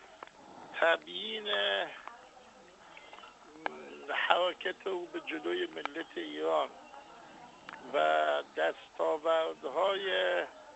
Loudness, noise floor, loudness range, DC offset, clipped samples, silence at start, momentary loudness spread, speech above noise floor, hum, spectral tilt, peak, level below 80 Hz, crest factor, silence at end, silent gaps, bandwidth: -33 LUFS; -56 dBFS; 5 LU; under 0.1%; under 0.1%; 0 s; 22 LU; 24 dB; none; -3 dB/octave; -8 dBFS; -78 dBFS; 26 dB; 0 s; none; 8.2 kHz